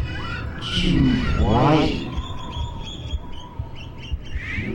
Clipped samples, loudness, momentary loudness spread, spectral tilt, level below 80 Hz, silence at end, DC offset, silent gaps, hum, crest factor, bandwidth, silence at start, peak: under 0.1%; -23 LUFS; 17 LU; -6.5 dB/octave; -30 dBFS; 0 s; under 0.1%; none; none; 18 dB; 10.5 kHz; 0 s; -4 dBFS